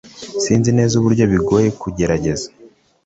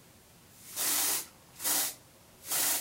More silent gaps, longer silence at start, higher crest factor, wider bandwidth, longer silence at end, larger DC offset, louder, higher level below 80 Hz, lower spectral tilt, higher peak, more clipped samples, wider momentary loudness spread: neither; second, 0.05 s vs 0.55 s; about the same, 14 dB vs 18 dB; second, 8.2 kHz vs 16 kHz; first, 0.4 s vs 0 s; neither; first, -16 LUFS vs -30 LUFS; first, -40 dBFS vs -70 dBFS; first, -6 dB/octave vs 1 dB/octave; first, -2 dBFS vs -16 dBFS; neither; second, 10 LU vs 19 LU